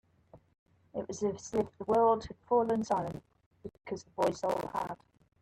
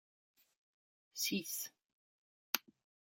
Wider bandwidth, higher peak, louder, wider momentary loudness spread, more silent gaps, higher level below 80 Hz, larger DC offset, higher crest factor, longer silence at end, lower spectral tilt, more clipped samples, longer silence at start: second, 14.5 kHz vs 17 kHz; second, -18 dBFS vs -10 dBFS; first, -33 LUFS vs -40 LUFS; first, 19 LU vs 10 LU; second, 0.59-0.66 s, 3.46-3.51 s vs 1.93-2.53 s; first, -64 dBFS vs -86 dBFS; neither; second, 16 dB vs 36 dB; second, 0.45 s vs 0.6 s; first, -6 dB/octave vs -1.5 dB/octave; neither; second, 0.35 s vs 1.15 s